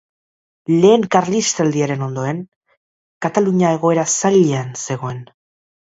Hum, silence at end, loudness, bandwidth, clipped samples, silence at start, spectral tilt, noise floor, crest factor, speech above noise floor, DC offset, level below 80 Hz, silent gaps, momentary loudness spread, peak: none; 0.7 s; -16 LUFS; 8 kHz; under 0.1%; 0.7 s; -5 dB/octave; under -90 dBFS; 18 dB; over 74 dB; under 0.1%; -60 dBFS; 2.56-2.61 s, 2.77-3.21 s; 13 LU; 0 dBFS